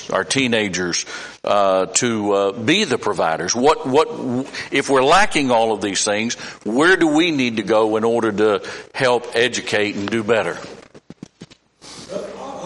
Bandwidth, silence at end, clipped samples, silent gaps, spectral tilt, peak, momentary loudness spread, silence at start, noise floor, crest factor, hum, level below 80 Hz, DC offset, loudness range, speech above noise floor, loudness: 11.5 kHz; 0 s; under 0.1%; none; -3.5 dB/octave; -2 dBFS; 13 LU; 0 s; -45 dBFS; 16 dB; none; -54 dBFS; under 0.1%; 5 LU; 27 dB; -18 LUFS